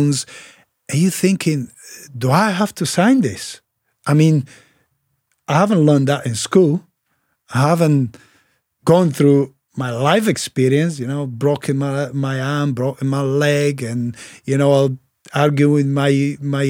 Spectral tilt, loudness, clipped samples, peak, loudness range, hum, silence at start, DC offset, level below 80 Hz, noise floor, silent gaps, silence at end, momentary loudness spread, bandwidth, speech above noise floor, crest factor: -6 dB/octave; -17 LUFS; under 0.1%; -2 dBFS; 2 LU; none; 0 s; under 0.1%; -64 dBFS; -68 dBFS; none; 0 s; 12 LU; 16.5 kHz; 52 dB; 16 dB